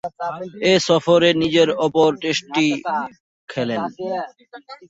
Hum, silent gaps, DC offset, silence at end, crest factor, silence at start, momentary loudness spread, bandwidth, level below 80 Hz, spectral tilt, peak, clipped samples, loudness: none; 3.20-3.48 s; under 0.1%; 0.05 s; 16 dB; 0.05 s; 13 LU; 8 kHz; -58 dBFS; -4.5 dB/octave; -2 dBFS; under 0.1%; -19 LUFS